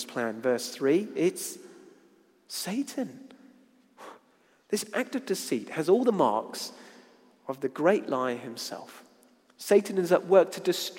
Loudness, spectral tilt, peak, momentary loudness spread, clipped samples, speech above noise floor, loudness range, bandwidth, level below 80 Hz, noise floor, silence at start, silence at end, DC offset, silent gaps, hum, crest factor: -28 LUFS; -4.5 dB/octave; -8 dBFS; 17 LU; under 0.1%; 37 dB; 9 LU; 16.5 kHz; -84 dBFS; -64 dBFS; 0 s; 0 s; under 0.1%; none; none; 20 dB